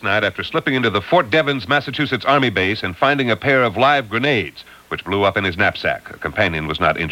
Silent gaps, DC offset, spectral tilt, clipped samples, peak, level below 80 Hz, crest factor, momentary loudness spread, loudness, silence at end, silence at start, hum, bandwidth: none; under 0.1%; -6 dB/octave; under 0.1%; -2 dBFS; -46 dBFS; 16 dB; 7 LU; -17 LUFS; 0 s; 0 s; none; 17 kHz